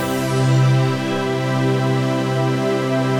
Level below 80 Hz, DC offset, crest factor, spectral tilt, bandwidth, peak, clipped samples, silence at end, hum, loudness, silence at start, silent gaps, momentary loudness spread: -52 dBFS; under 0.1%; 12 dB; -6.5 dB/octave; 16 kHz; -6 dBFS; under 0.1%; 0 s; none; -18 LUFS; 0 s; none; 5 LU